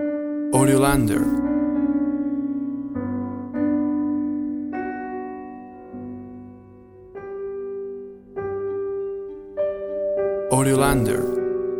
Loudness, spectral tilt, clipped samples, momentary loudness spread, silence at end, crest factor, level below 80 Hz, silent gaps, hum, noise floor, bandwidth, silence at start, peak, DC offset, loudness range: -23 LUFS; -6 dB/octave; under 0.1%; 18 LU; 0 s; 20 dB; -44 dBFS; none; none; -45 dBFS; 16.5 kHz; 0 s; -4 dBFS; under 0.1%; 12 LU